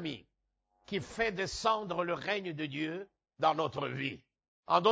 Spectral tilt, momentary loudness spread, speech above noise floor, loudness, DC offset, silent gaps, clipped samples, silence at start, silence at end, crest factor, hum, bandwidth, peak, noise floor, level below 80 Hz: -4.5 dB/octave; 11 LU; 46 dB; -34 LUFS; under 0.1%; 4.48-4.63 s; under 0.1%; 0 s; 0 s; 22 dB; none; 8 kHz; -12 dBFS; -81 dBFS; -64 dBFS